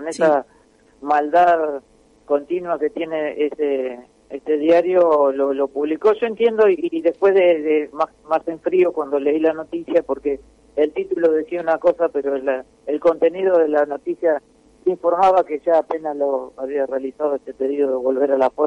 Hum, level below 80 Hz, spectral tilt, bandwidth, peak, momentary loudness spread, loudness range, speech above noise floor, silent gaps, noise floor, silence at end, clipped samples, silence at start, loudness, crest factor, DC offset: none; -60 dBFS; -6 dB/octave; 10.5 kHz; -6 dBFS; 10 LU; 3 LU; 35 dB; none; -54 dBFS; 0 s; under 0.1%; 0 s; -19 LUFS; 14 dB; under 0.1%